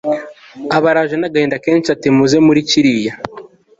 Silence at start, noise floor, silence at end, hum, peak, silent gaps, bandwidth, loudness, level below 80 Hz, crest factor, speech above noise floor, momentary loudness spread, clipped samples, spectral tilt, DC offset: 0.05 s; -37 dBFS; 0.35 s; none; -2 dBFS; none; 7.8 kHz; -13 LUFS; -52 dBFS; 12 dB; 24 dB; 17 LU; under 0.1%; -5 dB/octave; under 0.1%